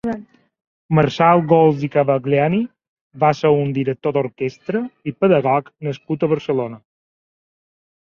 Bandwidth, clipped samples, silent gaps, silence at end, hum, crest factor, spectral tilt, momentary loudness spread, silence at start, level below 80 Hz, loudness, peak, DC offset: 7 kHz; under 0.1%; 0.67-0.89 s, 2.88-3.11 s; 1.25 s; none; 18 dB; -8 dB/octave; 13 LU; 0.05 s; -56 dBFS; -18 LUFS; -2 dBFS; under 0.1%